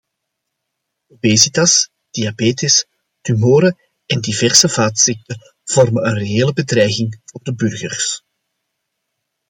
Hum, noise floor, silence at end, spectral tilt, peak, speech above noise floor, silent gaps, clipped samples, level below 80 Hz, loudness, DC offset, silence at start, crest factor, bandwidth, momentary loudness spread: none; -76 dBFS; 1.3 s; -3.5 dB/octave; 0 dBFS; 61 dB; none; under 0.1%; -56 dBFS; -14 LUFS; under 0.1%; 1.25 s; 16 dB; 16.5 kHz; 17 LU